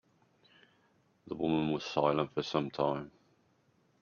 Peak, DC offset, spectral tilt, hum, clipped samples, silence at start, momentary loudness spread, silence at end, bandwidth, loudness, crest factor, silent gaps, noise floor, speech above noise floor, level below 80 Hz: -14 dBFS; under 0.1%; -6.5 dB/octave; none; under 0.1%; 1.25 s; 10 LU; 0.9 s; 7 kHz; -33 LUFS; 22 dB; none; -71 dBFS; 39 dB; -70 dBFS